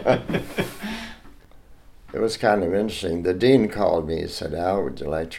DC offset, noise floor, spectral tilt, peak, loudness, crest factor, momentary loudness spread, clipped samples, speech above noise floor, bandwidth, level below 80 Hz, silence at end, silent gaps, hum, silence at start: under 0.1%; -47 dBFS; -6 dB/octave; -4 dBFS; -23 LUFS; 20 dB; 14 LU; under 0.1%; 25 dB; 16.5 kHz; -44 dBFS; 0 s; none; none; 0 s